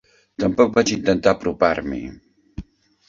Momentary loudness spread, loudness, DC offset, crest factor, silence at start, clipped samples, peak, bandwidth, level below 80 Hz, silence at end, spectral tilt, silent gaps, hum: 22 LU; -19 LUFS; under 0.1%; 20 dB; 0.4 s; under 0.1%; -2 dBFS; 7.8 kHz; -44 dBFS; 0.45 s; -5 dB/octave; none; none